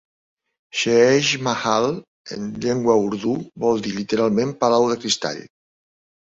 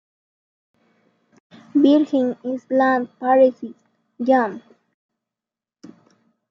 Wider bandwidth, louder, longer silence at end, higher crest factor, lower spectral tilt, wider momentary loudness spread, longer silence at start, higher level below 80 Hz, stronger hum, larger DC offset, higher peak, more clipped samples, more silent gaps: first, 8 kHz vs 7.2 kHz; about the same, -20 LUFS vs -19 LUFS; second, 0.85 s vs 1.9 s; about the same, 18 dB vs 18 dB; second, -4 dB/octave vs -6.5 dB/octave; about the same, 13 LU vs 14 LU; second, 0.75 s vs 1.75 s; first, -58 dBFS vs -76 dBFS; neither; neither; about the same, -4 dBFS vs -4 dBFS; neither; first, 2.08-2.24 s vs none